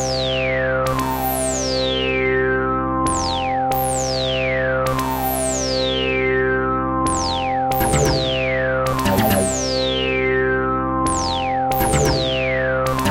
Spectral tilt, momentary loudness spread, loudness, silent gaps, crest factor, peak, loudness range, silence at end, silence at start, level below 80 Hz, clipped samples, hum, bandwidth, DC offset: -4 dB/octave; 3 LU; -19 LUFS; none; 14 dB; -6 dBFS; 1 LU; 0 s; 0 s; -32 dBFS; under 0.1%; none; 16.5 kHz; under 0.1%